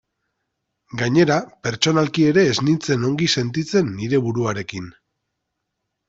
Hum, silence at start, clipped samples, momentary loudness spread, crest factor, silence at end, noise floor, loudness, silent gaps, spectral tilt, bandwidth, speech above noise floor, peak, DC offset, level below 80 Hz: none; 0.95 s; under 0.1%; 12 LU; 18 dB; 1.2 s; -78 dBFS; -19 LUFS; none; -5 dB/octave; 8 kHz; 59 dB; -2 dBFS; under 0.1%; -56 dBFS